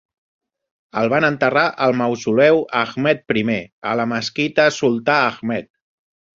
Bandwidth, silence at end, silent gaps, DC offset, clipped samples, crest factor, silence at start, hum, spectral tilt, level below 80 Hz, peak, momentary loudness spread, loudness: 7.6 kHz; 0.75 s; 3.72-3.82 s; under 0.1%; under 0.1%; 18 dB; 0.95 s; none; -5.5 dB/octave; -60 dBFS; -2 dBFS; 9 LU; -18 LUFS